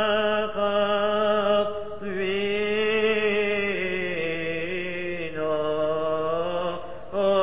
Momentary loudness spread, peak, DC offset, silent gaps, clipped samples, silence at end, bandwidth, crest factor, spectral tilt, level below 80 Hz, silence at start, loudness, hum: 8 LU; -10 dBFS; 1%; none; under 0.1%; 0 s; 4 kHz; 14 dB; -8.5 dB/octave; -54 dBFS; 0 s; -25 LUFS; none